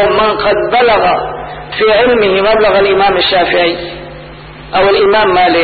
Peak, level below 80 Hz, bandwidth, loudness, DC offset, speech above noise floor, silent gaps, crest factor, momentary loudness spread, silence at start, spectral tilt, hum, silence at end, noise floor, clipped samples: 0 dBFS; -36 dBFS; 4.8 kHz; -9 LUFS; under 0.1%; 21 dB; none; 10 dB; 15 LU; 0 s; -10.5 dB/octave; none; 0 s; -30 dBFS; under 0.1%